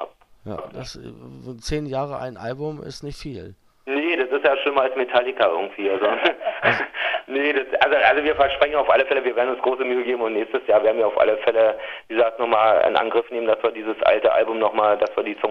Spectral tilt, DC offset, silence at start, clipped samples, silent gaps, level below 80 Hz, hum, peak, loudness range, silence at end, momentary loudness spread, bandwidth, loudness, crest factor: -5 dB/octave; under 0.1%; 0 s; under 0.1%; none; -50 dBFS; none; 0 dBFS; 9 LU; 0 s; 17 LU; 11.5 kHz; -20 LUFS; 20 dB